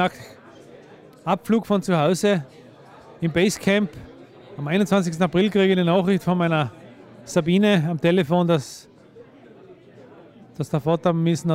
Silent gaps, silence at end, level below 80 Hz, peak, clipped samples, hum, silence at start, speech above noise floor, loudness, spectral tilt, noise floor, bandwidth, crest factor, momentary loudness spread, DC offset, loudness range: none; 0 s; -58 dBFS; -6 dBFS; under 0.1%; none; 0 s; 27 dB; -21 LUFS; -6 dB/octave; -47 dBFS; 15.5 kHz; 16 dB; 15 LU; under 0.1%; 4 LU